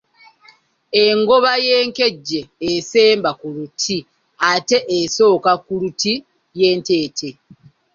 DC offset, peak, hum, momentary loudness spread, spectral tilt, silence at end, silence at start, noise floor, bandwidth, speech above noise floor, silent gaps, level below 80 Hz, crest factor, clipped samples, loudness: under 0.1%; -2 dBFS; none; 12 LU; -3 dB/octave; 0.65 s; 0.95 s; -51 dBFS; 7.6 kHz; 35 dB; none; -60 dBFS; 16 dB; under 0.1%; -16 LUFS